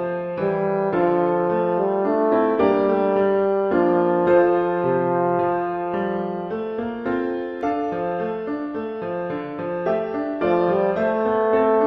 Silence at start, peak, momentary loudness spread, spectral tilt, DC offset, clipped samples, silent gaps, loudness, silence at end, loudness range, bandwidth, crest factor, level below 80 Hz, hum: 0 s; -4 dBFS; 9 LU; -9.5 dB/octave; under 0.1%; under 0.1%; none; -21 LUFS; 0 s; 7 LU; 5.8 kHz; 16 dB; -56 dBFS; none